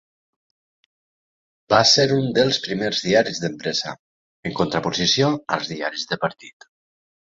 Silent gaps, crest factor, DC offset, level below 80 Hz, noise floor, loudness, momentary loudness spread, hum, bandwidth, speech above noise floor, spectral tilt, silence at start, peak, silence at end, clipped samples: 3.99-4.43 s; 22 dB; under 0.1%; -56 dBFS; under -90 dBFS; -20 LUFS; 12 LU; none; 7.8 kHz; over 69 dB; -3.5 dB/octave; 1.7 s; -2 dBFS; 0.85 s; under 0.1%